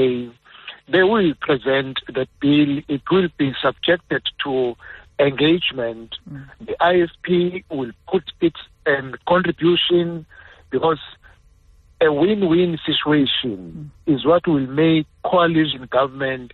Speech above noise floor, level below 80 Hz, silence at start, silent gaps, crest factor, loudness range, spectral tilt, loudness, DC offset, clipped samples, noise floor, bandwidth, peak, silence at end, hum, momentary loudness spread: 33 dB; -52 dBFS; 0 s; none; 14 dB; 2 LU; -8.5 dB/octave; -19 LUFS; under 0.1%; under 0.1%; -52 dBFS; 4.3 kHz; -4 dBFS; 0.05 s; none; 14 LU